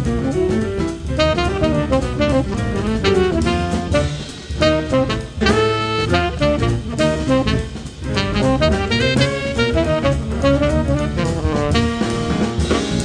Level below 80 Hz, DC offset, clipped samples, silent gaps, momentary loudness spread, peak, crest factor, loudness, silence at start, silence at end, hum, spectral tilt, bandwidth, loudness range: -28 dBFS; under 0.1%; under 0.1%; none; 5 LU; 0 dBFS; 16 dB; -18 LUFS; 0 s; 0 s; none; -6 dB/octave; 10 kHz; 1 LU